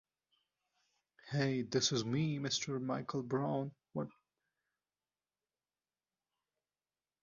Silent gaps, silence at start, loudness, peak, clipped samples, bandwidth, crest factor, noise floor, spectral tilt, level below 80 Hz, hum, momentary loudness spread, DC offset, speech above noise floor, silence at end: none; 1.25 s; -37 LUFS; -20 dBFS; under 0.1%; 7.2 kHz; 22 dB; under -90 dBFS; -5 dB/octave; -76 dBFS; none; 11 LU; under 0.1%; over 53 dB; 3.1 s